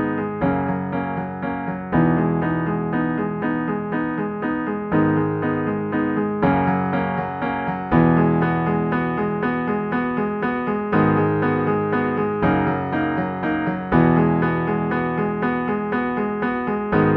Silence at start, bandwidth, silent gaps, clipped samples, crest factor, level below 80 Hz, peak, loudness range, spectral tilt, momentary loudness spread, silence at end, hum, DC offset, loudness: 0 s; 4.3 kHz; none; under 0.1%; 18 dB; -44 dBFS; -4 dBFS; 2 LU; -11 dB/octave; 6 LU; 0 s; none; under 0.1%; -21 LUFS